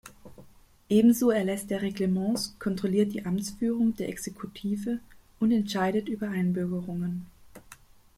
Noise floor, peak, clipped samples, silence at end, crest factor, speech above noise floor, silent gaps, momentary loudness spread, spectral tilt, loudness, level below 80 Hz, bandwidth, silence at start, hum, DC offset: -54 dBFS; -10 dBFS; under 0.1%; 0.45 s; 18 dB; 27 dB; none; 12 LU; -6 dB/octave; -28 LUFS; -60 dBFS; 16 kHz; 0.05 s; none; under 0.1%